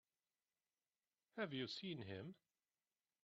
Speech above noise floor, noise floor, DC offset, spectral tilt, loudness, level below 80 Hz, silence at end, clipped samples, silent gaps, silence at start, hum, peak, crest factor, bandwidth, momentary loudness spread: over 41 dB; under -90 dBFS; under 0.1%; -3.5 dB/octave; -50 LUFS; under -90 dBFS; 0.9 s; under 0.1%; none; 1.35 s; none; -32 dBFS; 22 dB; 6.8 kHz; 12 LU